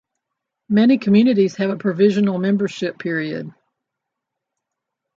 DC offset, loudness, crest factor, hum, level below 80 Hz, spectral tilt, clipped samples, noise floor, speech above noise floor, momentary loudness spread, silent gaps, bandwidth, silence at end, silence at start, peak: under 0.1%; -18 LUFS; 16 dB; none; -66 dBFS; -7.5 dB/octave; under 0.1%; -81 dBFS; 64 dB; 11 LU; none; 7.4 kHz; 1.65 s; 0.7 s; -4 dBFS